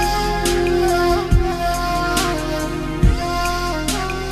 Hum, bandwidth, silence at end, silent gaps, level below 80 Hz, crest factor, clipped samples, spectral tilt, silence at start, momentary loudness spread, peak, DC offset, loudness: none; 13.5 kHz; 0 s; none; -24 dBFS; 16 dB; under 0.1%; -5 dB/octave; 0 s; 5 LU; -2 dBFS; under 0.1%; -19 LUFS